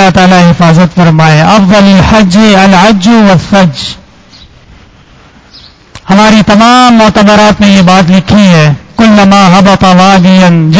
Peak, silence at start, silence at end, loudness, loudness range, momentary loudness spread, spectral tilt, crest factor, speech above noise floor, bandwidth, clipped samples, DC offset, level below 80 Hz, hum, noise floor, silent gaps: 0 dBFS; 0 s; 0 s; -3 LUFS; 6 LU; 3 LU; -6 dB/octave; 4 dB; 34 dB; 8 kHz; 20%; 1%; -28 dBFS; none; -36 dBFS; none